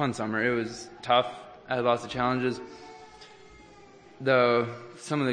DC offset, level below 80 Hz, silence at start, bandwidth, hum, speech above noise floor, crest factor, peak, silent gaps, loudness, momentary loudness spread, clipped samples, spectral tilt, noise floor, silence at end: under 0.1%; -62 dBFS; 0 s; 9.8 kHz; none; 25 dB; 20 dB; -8 dBFS; none; -27 LUFS; 21 LU; under 0.1%; -5.5 dB/octave; -52 dBFS; 0 s